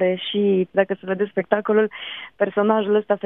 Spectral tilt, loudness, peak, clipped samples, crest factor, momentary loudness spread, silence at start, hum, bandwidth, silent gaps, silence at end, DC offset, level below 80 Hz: -9.5 dB/octave; -21 LUFS; -2 dBFS; under 0.1%; 18 dB; 6 LU; 0 s; none; 3.9 kHz; none; 0.1 s; under 0.1%; -70 dBFS